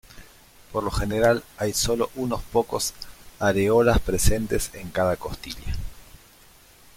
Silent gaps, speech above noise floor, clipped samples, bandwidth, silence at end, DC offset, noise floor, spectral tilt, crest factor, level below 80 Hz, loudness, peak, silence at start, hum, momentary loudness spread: none; 29 dB; under 0.1%; 16.5 kHz; 0.95 s; under 0.1%; -52 dBFS; -4.5 dB/octave; 20 dB; -34 dBFS; -24 LUFS; -4 dBFS; 0.15 s; none; 15 LU